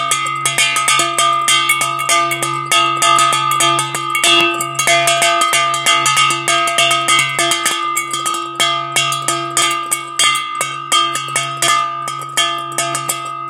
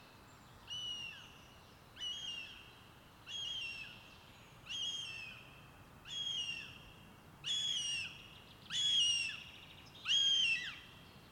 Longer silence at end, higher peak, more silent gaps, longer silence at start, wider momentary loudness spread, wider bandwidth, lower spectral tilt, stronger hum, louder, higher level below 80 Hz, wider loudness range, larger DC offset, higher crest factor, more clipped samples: about the same, 0 s vs 0 s; first, 0 dBFS vs -24 dBFS; neither; about the same, 0 s vs 0 s; second, 7 LU vs 26 LU; about the same, 17 kHz vs 18 kHz; about the same, -0.5 dB/octave vs 0.5 dB/octave; neither; first, -13 LUFS vs -37 LUFS; about the same, -66 dBFS vs -70 dBFS; second, 3 LU vs 11 LU; neither; about the same, 14 dB vs 18 dB; neither